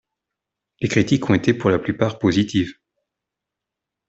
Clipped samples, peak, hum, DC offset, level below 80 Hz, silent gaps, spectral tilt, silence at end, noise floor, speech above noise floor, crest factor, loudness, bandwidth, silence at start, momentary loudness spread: under 0.1%; -2 dBFS; none; under 0.1%; -52 dBFS; none; -6.5 dB/octave; 1.35 s; -84 dBFS; 66 dB; 18 dB; -20 LUFS; 8 kHz; 0.8 s; 6 LU